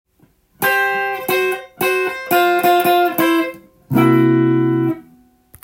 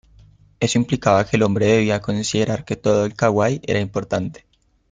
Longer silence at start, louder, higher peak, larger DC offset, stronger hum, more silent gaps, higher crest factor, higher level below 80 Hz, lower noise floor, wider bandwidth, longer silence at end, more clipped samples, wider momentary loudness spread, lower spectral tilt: about the same, 0.6 s vs 0.6 s; first, -16 LUFS vs -19 LUFS; about the same, -2 dBFS vs -2 dBFS; neither; neither; neither; about the same, 16 dB vs 18 dB; second, -56 dBFS vs -50 dBFS; first, -56 dBFS vs -50 dBFS; first, 17 kHz vs 9.4 kHz; about the same, 0.6 s vs 0.6 s; neither; about the same, 7 LU vs 7 LU; about the same, -5.5 dB/octave vs -5.5 dB/octave